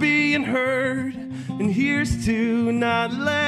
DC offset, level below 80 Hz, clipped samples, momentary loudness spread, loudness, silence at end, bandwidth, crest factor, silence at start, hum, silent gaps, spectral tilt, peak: under 0.1%; -44 dBFS; under 0.1%; 8 LU; -22 LUFS; 0 s; 12.5 kHz; 14 dB; 0 s; none; none; -5.5 dB/octave; -8 dBFS